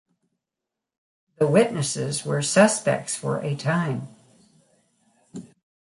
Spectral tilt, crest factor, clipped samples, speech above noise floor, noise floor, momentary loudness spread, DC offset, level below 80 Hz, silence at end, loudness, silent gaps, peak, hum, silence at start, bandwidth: -4.5 dB/octave; 20 dB; under 0.1%; 64 dB; -86 dBFS; 24 LU; under 0.1%; -66 dBFS; 0.45 s; -23 LUFS; none; -4 dBFS; none; 1.4 s; 11.5 kHz